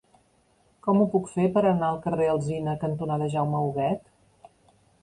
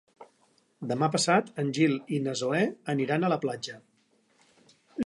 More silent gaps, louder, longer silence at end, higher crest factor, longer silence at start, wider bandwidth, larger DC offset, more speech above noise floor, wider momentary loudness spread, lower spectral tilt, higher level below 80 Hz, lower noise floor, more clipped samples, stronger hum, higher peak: neither; about the same, -26 LUFS vs -28 LUFS; first, 1.05 s vs 0.05 s; about the same, 16 dB vs 20 dB; first, 0.85 s vs 0.2 s; about the same, 11 kHz vs 11.5 kHz; neither; about the same, 40 dB vs 40 dB; second, 7 LU vs 14 LU; first, -8 dB/octave vs -5 dB/octave; first, -60 dBFS vs -72 dBFS; about the same, -64 dBFS vs -67 dBFS; neither; neither; about the same, -10 dBFS vs -8 dBFS